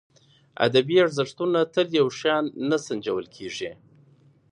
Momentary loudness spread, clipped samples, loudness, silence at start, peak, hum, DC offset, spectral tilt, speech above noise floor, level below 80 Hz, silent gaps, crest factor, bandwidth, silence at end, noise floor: 13 LU; under 0.1%; -24 LUFS; 0.6 s; -4 dBFS; none; under 0.1%; -5 dB/octave; 34 dB; -68 dBFS; none; 20 dB; 10.5 kHz; 0.8 s; -57 dBFS